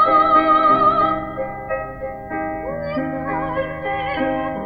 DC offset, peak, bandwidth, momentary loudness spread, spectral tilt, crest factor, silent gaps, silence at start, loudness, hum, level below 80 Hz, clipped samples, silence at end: under 0.1%; -4 dBFS; 5.2 kHz; 14 LU; -8.5 dB/octave; 16 dB; none; 0 s; -19 LUFS; none; -44 dBFS; under 0.1%; 0 s